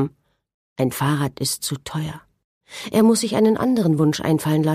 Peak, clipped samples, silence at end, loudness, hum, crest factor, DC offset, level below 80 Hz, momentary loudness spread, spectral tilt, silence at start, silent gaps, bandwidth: -6 dBFS; under 0.1%; 0 s; -20 LUFS; none; 16 dB; under 0.1%; -56 dBFS; 15 LU; -5.5 dB/octave; 0 s; 0.54-0.76 s, 2.44-2.61 s; 15.5 kHz